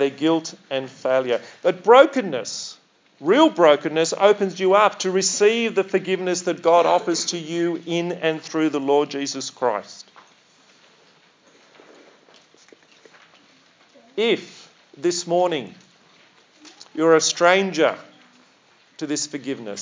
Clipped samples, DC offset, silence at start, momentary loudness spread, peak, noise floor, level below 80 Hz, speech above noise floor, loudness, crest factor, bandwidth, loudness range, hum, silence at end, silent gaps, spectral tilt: under 0.1%; under 0.1%; 0 s; 13 LU; 0 dBFS; -56 dBFS; -86 dBFS; 37 dB; -20 LUFS; 22 dB; 7.8 kHz; 12 LU; none; 0 s; none; -3.5 dB/octave